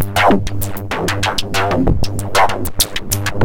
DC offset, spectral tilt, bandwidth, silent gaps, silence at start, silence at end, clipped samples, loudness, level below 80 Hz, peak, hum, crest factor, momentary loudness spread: under 0.1%; -4 dB/octave; 17.5 kHz; none; 0 s; 0 s; under 0.1%; -17 LUFS; -26 dBFS; -2 dBFS; none; 14 dB; 7 LU